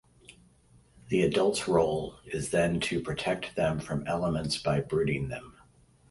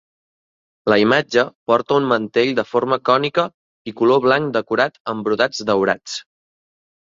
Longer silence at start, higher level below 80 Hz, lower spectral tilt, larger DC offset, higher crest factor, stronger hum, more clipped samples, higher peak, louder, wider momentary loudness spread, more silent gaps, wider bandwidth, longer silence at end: first, 1.05 s vs 0.85 s; first, -52 dBFS vs -60 dBFS; about the same, -5.5 dB/octave vs -5 dB/octave; neither; about the same, 20 dB vs 18 dB; neither; neither; second, -10 dBFS vs 0 dBFS; second, -29 LUFS vs -18 LUFS; about the same, 8 LU vs 10 LU; second, none vs 1.55-1.66 s, 3.54-3.85 s, 5.00-5.05 s; first, 11.5 kHz vs 7.8 kHz; second, 0.6 s vs 0.8 s